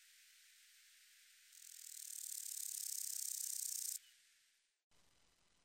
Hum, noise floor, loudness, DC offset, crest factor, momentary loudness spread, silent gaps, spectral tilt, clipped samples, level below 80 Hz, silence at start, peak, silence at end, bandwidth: none; -78 dBFS; -44 LUFS; under 0.1%; 22 dB; 23 LU; 4.84-4.90 s; 5.5 dB/octave; under 0.1%; under -90 dBFS; 0 s; -28 dBFS; 0.65 s; 16 kHz